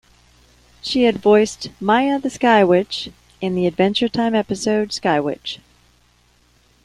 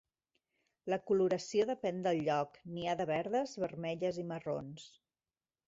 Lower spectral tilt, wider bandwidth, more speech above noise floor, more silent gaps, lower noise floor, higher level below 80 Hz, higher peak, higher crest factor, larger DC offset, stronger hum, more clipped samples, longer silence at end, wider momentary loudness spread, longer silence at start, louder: about the same, -5 dB/octave vs -5 dB/octave; first, 12 kHz vs 8 kHz; second, 39 dB vs over 55 dB; neither; second, -57 dBFS vs under -90 dBFS; first, -54 dBFS vs -74 dBFS; first, -2 dBFS vs -20 dBFS; about the same, 16 dB vs 16 dB; neither; first, 60 Hz at -40 dBFS vs none; neither; first, 1.3 s vs 0.8 s; first, 13 LU vs 10 LU; about the same, 0.85 s vs 0.85 s; first, -18 LUFS vs -36 LUFS